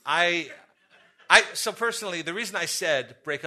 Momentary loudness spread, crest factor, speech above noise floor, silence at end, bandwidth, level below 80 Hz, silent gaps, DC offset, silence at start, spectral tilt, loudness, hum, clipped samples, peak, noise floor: 12 LU; 26 dB; 34 dB; 0 s; 13.5 kHz; -68 dBFS; none; under 0.1%; 0.05 s; -1 dB/octave; -24 LUFS; none; under 0.1%; 0 dBFS; -60 dBFS